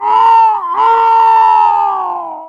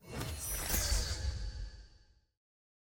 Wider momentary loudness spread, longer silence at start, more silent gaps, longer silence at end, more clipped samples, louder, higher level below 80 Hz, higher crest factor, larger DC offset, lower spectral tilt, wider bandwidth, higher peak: second, 8 LU vs 14 LU; about the same, 0 s vs 0.05 s; neither; second, 0 s vs 0.95 s; neither; first, -9 LUFS vs -36 LUFS; second, -64 dBFS vs -42 dBFS; second, 8 dB vs 20 dB; neither; about the same, -2.5 dB/octave vs -2.5 dB/octave; second, 6.8 kHz vs 17 kHz; first, -2 dBFS vs -18 dBFS